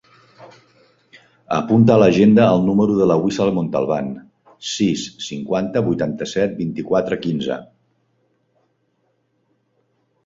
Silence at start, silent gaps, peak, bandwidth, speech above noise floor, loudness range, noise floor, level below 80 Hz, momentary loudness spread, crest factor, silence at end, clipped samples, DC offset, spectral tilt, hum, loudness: 0.4 s; none; 0 dBFS; 7.8 kHz; 50 dB; 10 LU; -66 dBFS; -54 dBFS; 15 LU; 18 dB; 2.6 s; under 0.1%; under 0.1%; -6.5 dB/octave; none; -18 LUFS